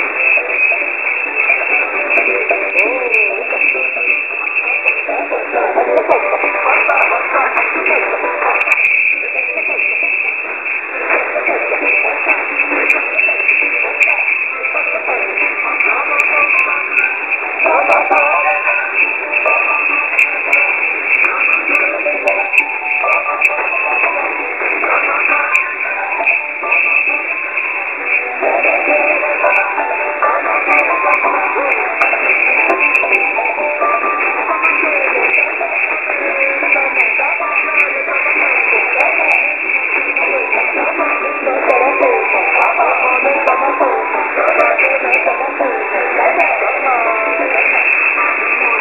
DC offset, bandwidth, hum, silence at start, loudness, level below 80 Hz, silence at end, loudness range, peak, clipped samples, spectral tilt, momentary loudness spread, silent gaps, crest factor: 0.4%; 13.5 kHz; none; 0 s; -12 LUFS; -62 dBFS; 0 s; 2 LU; 0 dBFS; under 0.1%; -3.5 dB/octave; 5 LU; none; 14 dB